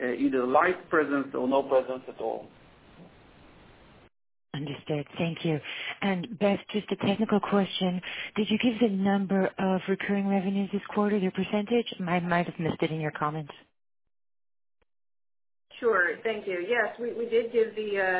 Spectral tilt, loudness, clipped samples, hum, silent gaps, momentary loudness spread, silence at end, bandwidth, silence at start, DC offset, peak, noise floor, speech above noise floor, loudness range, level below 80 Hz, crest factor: -4.5 dB/octave; -28 LUFS; under 0.1%; none; none; 9 LU; 0 s; 4 kHz; 0 s; under 0.1%; -10 dBFS; -55 dBFS; 27 dB; 8 LU; -66 dBFS; 20 dB